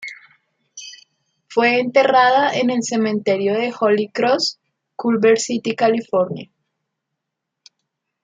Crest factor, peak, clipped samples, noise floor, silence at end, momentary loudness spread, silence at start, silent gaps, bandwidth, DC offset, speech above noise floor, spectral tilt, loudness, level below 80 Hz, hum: 18 dB; -2 dBFS; under 0.1%; -80 dBFS; 1.8 s; 19 LU; 0 s; none; 9.4 kHz; under 0.1%; 63 dB; -4 dB/octave; -17 LUFS; -70 dBFS; none